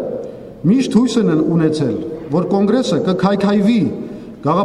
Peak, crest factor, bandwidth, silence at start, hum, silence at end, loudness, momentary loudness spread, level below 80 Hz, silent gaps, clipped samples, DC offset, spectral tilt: -2 dBFS; 14 dB; 11 kHz; 0 s; none; 0 s; -16 LUFS; 11 LU; -50 dBFS; none; under 0.1%; under 0.1%; -7 dB/octave